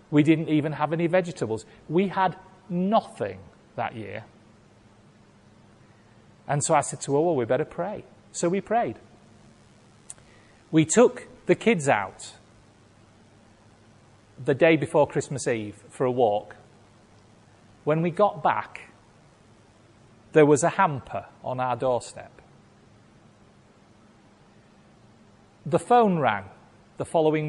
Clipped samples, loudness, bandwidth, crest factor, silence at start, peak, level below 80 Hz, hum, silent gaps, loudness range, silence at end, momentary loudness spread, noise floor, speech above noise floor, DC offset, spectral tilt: under 0.1%; -24 LUFS; 11.5 kHz; 20 dB; 0.1 s; -6 dBFS; -62 dBFS; none; none; 7 LU; 0 s; 21 LU; -56 dBFS; 32 dB; under 0.1%; -5.5 dB/octave